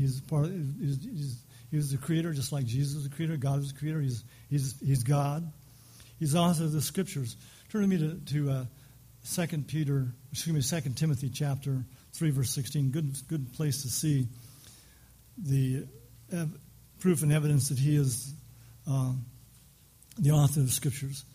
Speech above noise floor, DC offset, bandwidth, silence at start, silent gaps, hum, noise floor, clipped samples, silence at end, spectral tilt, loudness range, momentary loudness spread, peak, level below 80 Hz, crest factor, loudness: 29 dB; under 0.1%; 15.5 kHz; 0 s; none; none; -58 dBFS; under 0.1%; 0.1 s; -6 dB/octave; 3 LU; 12 LU; -14 dBFS; -58 dBFS; 16 dB; -31 LUFS